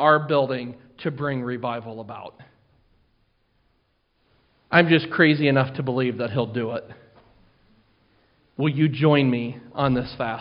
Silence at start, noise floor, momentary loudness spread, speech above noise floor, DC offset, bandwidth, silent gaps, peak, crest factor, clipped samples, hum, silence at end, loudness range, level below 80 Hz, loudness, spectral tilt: 0 s; -68 dBFS; 18 LU; 46 dB; under 0.1%; 5.4 kHz; none; 0 dBFS; 24 dB; under 0.1%; none; 0 s; 11 LU; -58 dBFS; -22 LUFS; -5 dB/octave